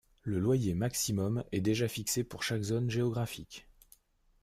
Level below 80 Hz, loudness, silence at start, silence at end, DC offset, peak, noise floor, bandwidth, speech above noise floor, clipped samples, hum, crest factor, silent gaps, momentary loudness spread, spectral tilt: -58 dBFS; -33 LUFS; 0.25 s; 0.8 s; under 0.1%; -18 dBFS; -65 dBFS; 16 kHz; 33 dB; under 0.1%; none; 14 dB; none; 8 LU; -5 dB/octave